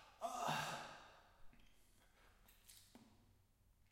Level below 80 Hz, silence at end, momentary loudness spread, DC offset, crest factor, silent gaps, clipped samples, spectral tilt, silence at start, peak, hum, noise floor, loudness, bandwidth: -74 dBFS; 0.7 s; 24 LU; under 0.1%; 22 dB; none; under 0.1%; -3 dB/octave; 0 s; -30 dBFS; none; -74 dBFS; -46 LUFS; 16.5 kHz